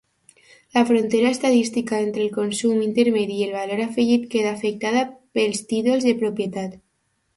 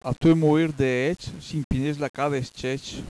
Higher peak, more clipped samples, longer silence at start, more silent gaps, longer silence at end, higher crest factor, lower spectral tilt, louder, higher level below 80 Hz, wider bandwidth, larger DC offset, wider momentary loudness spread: first, -6 dBFS vs -10 dBFS; neither; first, 0.75 s vs 0.05 s; second, none vs 1.64-1.70 s, 2.09-2.14 s; first, 0.6 s vs 0 s; about the same, 16 dB vs 14 dB; second, -4.5 dB/octave vs -7 dB/octave; first, -21 LUFS vs -24 LUFS; second, -64 dBFS vs -44 dBFS; about the same, 11.5 kHz vs 11 kHz; neither; second, 6 LU vs 11 LU